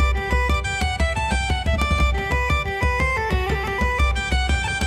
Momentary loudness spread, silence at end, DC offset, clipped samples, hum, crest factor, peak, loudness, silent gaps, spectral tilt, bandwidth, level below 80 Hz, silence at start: 2 LU; 0 s; under 0.1%; under 0.1%; none; 14 dB; -8 dBFS; -21 LUFS; none; -5 dB/octave; 13 kHz; -24 dBFS; 0 s